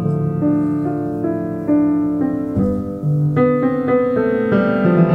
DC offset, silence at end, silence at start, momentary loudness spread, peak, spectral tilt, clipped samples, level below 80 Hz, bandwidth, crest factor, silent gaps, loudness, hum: under 0.1%; 0 s; 0 s; 6 LU; -2 dBFS; -10.5 dB/octave; under 0.1%; -44 dBFS; 4.6 kHz; 14 dB; none; -17 LUFS; none